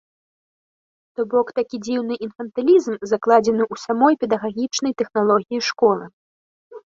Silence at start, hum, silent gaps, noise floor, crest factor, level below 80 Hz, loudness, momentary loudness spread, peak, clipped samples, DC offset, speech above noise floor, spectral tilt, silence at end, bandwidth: 1.2 s; none; 6.13-6.71 s; under -90 dBFS; 18 dB; -64 dBFS; -20 LUFS; 10 LU; -2 dBFS; under 0.1%; under 0.1%; over 71 dB; -4.5 dB/octave; 0.15 s; 7.6 kHz